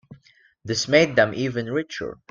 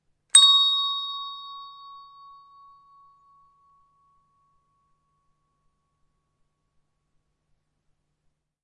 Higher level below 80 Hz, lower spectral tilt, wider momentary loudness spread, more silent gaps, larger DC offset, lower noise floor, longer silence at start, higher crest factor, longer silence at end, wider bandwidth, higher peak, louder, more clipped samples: first, -60 dBFS vs -76 dBFS; first, -4.5 dB/octave vs 6 dB/octave; second, 15 LU vs 26 LU; neither; neither; second, -57 dBFS vs -74 dBFS; second, 0.1 s vs 0.35 s; about the same, 22 dB vs 26 dB; second, 0.15 s vs 6.7 s; second, 8.8 kHz vs 11.5 kHz; about the same, -2 dBFS vs -2 dBFS; second, -22 LUFS vs -17 LUFS; neither